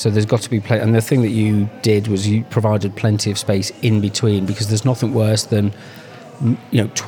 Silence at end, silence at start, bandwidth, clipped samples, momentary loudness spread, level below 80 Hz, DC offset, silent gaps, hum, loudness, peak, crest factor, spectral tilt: 0 s; 0 s; 17.5 kHz; under 0.1%; 5 LU; -58 dBFS; under 0.1%; none; none; -18 LUFS; -2 dBFS; 14 dB; -6 dB/octave